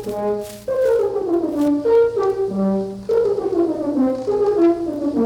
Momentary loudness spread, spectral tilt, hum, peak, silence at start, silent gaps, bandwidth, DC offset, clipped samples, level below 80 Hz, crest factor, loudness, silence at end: 7 LU; -7.5 dB/octave; none; -6 dBFS; 0 s; none; 18 kHz; under 0.1%; under 0.1%; -50 dBFS; 12 dB; -19 LUFS; 0 s